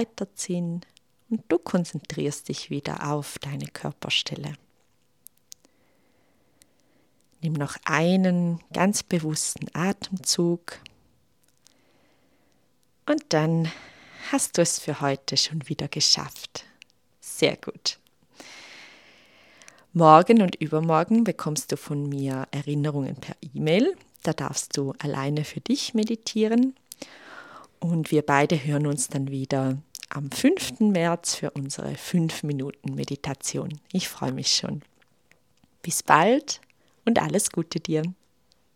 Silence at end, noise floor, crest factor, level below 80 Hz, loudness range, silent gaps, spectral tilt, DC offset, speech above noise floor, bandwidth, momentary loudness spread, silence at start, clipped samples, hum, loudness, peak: 0.65 s; -68 dBFS; 26 dB; -66 dBFS; 9 LU; none; -4.5 dB/octave; under 0.1%; 44 dB; 16.5 kHz; 15 LU; 0 s; under 0.1%; none; -25 LUFS; 0 dBFS